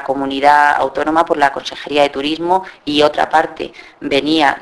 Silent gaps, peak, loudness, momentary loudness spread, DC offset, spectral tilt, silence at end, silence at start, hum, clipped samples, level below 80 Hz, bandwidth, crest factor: none; 0 dBFS; -14 LUFS; 11 LU; under 0.1%; -4 dB/octave; 0 s; 0 s; none; under 0.1%; -48 dBFS; 11 kHz; 14 dB